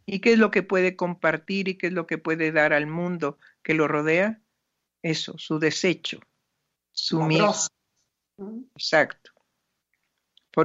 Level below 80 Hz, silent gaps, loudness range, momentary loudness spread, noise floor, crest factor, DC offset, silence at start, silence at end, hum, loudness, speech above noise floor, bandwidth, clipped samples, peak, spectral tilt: -72 dBFS; none; 3 LU; 13 LU; -80 dBFS; 20 dB; under 0.1%; 0.1 s; 0 s; none; -24 LUFS; 56 dB; 8 kHz; under 0.1%; -6 dBFS; -4.5 dB/octave